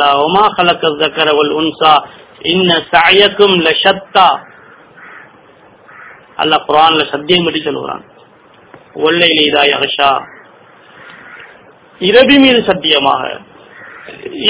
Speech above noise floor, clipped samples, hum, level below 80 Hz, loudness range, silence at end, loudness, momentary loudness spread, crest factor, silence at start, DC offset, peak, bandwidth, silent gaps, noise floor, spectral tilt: 33 dB; 1%; none; -50 dBFS; 4 LU; 0 s; -10 LUFS; 15 LU; 12 dB; 0 s; under 0.1%; 0 dBFS; 4 kHz; none; -43 dBFS; -8 dB/octave